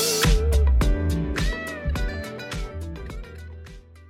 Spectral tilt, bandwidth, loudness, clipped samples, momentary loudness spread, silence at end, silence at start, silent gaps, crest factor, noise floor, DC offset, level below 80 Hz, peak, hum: -4.5 dB/octave; 17 kHz; -25 LUFS; under 0.1%; 20 LU; 0 s; 0 s; none; 16 dB; -43 dBFS; under 0.1%; -26 dBFS; -8 dBFS; none